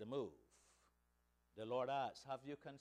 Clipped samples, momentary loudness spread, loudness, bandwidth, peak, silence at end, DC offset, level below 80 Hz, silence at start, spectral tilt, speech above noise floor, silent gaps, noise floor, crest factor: under 0.1%; 12 LU; -47 LUFS; 12.5 kHz; -32 dBFS; 0 s; under 0.1%; -82 dBFS; 0 s; -5.5 dB/octave; 35 dB; none; -81 dBFS; 16 dB